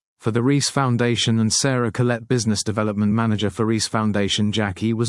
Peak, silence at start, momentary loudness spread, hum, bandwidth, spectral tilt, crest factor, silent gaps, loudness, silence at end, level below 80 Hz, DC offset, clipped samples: -4 dBFS; 0.25 s; 4 LU; none; 12 kHz; -4.5 dB/octave; 16 dB; none; -20 LUFS; 0 s; -58 dBFS; under 0.1%; under 0.1%